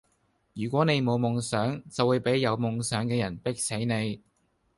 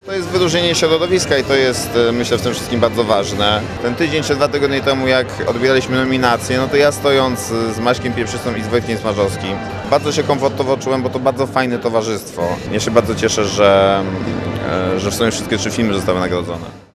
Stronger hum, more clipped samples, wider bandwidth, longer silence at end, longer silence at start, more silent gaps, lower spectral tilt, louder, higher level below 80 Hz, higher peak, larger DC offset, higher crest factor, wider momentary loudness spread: neither; neither; second, 11.5 kHz vs 15 kHz; first, 0.6 s vs 0.15 s; first, 0.55 s vs 0.05 s; neither; about the same, -5.5 dB/octave vs -4.5 dB/octave; second, -28 LUFS vs -16 LUFS; second, -60 dBFS vs -42 dBFS; second, -10 dBFS vs 0 dBFS; neither; about the same, 18 dB vs 16 dB; about the same, 7 LU vs 7 LU